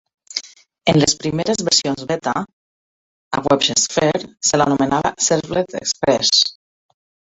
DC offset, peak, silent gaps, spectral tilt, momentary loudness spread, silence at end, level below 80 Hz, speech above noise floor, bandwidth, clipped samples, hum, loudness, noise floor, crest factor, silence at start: under 0.1%; -2 dBFS; 2.53-3.31 s; -3 dB/octave; 11 LU; 0.9 s; -52 dBFS; over 72 dB; 8.2 kHz; under 0.1%; none; -17 LUFS; under -90 dBFS; 18 dB; 0.3 s